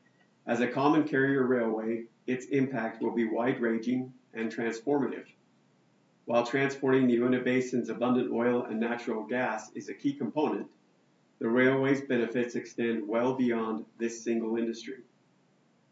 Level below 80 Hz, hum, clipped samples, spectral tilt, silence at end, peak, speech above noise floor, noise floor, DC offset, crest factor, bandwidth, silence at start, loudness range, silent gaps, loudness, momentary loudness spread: under -90 dBFS; none; under 0.1%; -6.5 dB/octave; 0.9 s; -12 dBFS; 38 dB; -67 dBFS; under 0.1%; 18 dB; 7.8 kHz; 0.45 s; 4 LU; none; -30 LUFS; 10 LU